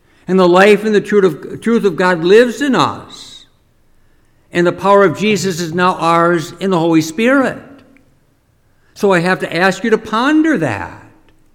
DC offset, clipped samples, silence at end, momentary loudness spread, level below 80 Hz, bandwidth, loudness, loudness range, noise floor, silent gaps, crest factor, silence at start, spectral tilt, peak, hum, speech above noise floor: under 0.1%; 0.1%; 0.55 s; 10 LU; -52 dBFS; 16 kHz; -13 LUFS; 4 LU; -55 dBFS; none; 14 dB; 0.3 s; -5.5 dB/octave; 0 dBFS; none; 42 dB